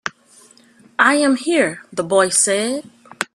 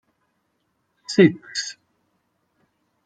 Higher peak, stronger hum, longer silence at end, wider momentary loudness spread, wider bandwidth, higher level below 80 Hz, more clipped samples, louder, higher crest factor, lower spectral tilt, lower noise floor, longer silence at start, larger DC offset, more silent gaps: about the same, 0 dBFS vs -2 dBFS; neither; second, 0.1 s vs 1.35 s; second, 14 LU vs 17 LU; first, 14.5 kHz vs 9.2 kHz; about the same, -66 dBFS vs -70 dBFS; neither; first, -17 LUFS vs -20 LUFS; second, 18 dB vs 24 dB; second, -2.5 dB/octave vs -5.5 dB/octave; second, -50 dBFS vs -72 dBFS; second, 0.05 s vs 1.1 s; neither; neither